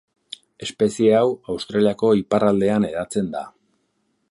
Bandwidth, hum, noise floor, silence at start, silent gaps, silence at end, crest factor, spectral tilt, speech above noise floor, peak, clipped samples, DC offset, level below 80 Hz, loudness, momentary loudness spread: 11.5 kHz; none; -69 dBFS; 0.6 s; none; 0.8 s; 18 dB; -6 dB/octave; 50 dB; -4 dBFS; under 0.1%; under 0.1%; -56 dBFS; -20 LUFS; 20 LU